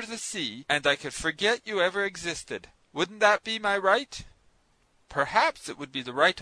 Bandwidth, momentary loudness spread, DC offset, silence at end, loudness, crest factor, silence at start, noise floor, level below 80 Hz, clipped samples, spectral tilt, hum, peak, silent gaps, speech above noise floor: 11 kHz; 14 LU; under 0.1%; 0 s; -27 LUFS; 22 dB; 0 s; -66 dBFS; -58 dBFS; under 0.1%; -2.5 dB/octave; none; -6 dBFS; none; 39 dB